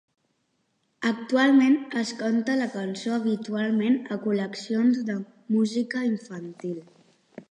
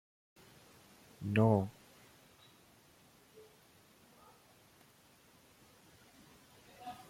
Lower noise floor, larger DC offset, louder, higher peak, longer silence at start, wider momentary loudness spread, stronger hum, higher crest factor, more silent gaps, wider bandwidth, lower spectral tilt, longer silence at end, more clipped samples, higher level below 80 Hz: first, -73 dBFS vs -65 dBFS; neither; first, -25 LUFS vs -34 LUFS; first, -10 dBFS vs -16 dBFS; second, 1 s vs 1.2 s; second, 14 LU vs 31 LU; neither; second, 16 dB vs 26 dB; neither; second, 10.5 kHz vs 16 kHz; second, -5.5 dB/octave vs -8 dB/octave; about the same, 0.1 s vs 0.05 s; neither; about the same, -78 dBFS vs -74 dBFS